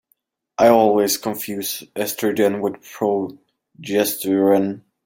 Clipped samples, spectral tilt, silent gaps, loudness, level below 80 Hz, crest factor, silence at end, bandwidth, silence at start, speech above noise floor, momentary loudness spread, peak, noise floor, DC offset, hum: under 0.1%; -4 dB/octave; none; -19 LUFS; -66 dBFS; 18 dB; 0.25 s; 17 kHz; 0.6 s; 49 dB; 12 LU; -2 dBFS; -67 dBFS; under 0.1%; none